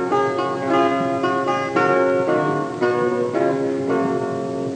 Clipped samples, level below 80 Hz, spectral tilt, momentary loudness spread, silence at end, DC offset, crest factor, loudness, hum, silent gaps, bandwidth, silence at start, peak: under 0.1%; -70 dBFS; -6.5 dB/octave; 4 LU; 0 s; under 0.1%; 14 dB; -20 LUFS; none; none; 9.4 kHz; 0 s; -4 dBFS